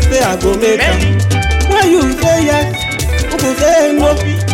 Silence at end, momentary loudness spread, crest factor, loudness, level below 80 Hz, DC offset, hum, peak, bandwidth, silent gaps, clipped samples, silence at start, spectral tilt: 0 s; 5 LU; 10 dB; -12 LUFS; -20 dBFS; under 0.1%; none; -2 dBFS; 16.5 kHz; none; under 0.1%; 0 s; -5 dB/octave